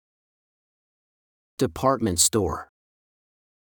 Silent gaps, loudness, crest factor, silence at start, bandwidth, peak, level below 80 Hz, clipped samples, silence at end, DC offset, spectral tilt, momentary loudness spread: none; -22 LUFS; 24 dB; 1.6 s; over 20 kHz; -6 dBFS; -52 dBFS; under 0.1%; 1 s; under 0.1%; -3.5 dB/octave; 14 LU